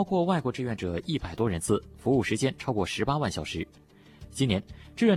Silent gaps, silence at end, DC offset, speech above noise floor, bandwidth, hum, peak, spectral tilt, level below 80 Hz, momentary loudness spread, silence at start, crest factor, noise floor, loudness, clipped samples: none; 0 s; under 0.1%; 22 dB; 14.5 kHz; none; -10 dBFS; -5.5 dB/octave; -50 dBFS; 9 LU; 0 s; 18 dB; -50 dBFS; -29 LUFS; under 0.1%